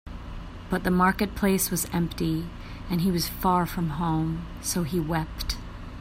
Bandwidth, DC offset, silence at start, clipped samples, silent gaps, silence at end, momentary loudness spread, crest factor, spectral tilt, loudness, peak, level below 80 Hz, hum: 16 kHz; under 0.1%; 0.05 s; under 0.1%; none; 0 s; 16 LU; 18 dB; -5 dB/octave; -27 LUFS; -10 dBFS; -40 dBFS; none